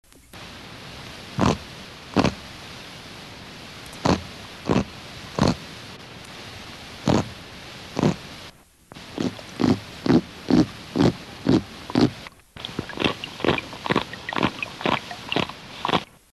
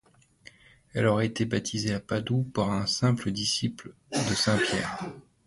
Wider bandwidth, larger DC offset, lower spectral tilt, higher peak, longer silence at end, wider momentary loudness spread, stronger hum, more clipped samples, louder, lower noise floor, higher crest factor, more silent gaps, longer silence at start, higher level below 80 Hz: first, 13 kHz vs 11.5 kHz; neither; about the same, -5.5 dB/octave vs -4.5 dB/octave; first, -6 dBFS vs -10 dBFS; about the same, 0.3 s vs 0.25 s; first, 17 LU vs 9 LU; neither; neither; first, -25 LUFS vs -28 LUFS; second, -47 dBFS vs -55 dBFS; about the same, 20 dB vs 18 dB; neither; second, 0.35 s vs 0.95 s; first, -46 dBFS vs -56 dBFS